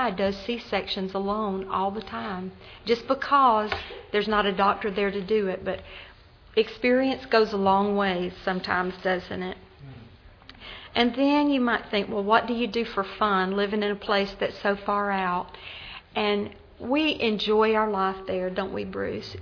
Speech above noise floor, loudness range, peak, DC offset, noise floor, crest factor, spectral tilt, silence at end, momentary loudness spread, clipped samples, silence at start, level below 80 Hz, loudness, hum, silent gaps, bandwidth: 24 dB; 3 LU; -6 dBFS; under 0.1%; -49 dBFS; 20 dB; -6.5 dB/octave; 0 s; 13 LU; under 0.1%; 0 s; -54 dBFS; -25 LUFS; none; none; 5.4 kHz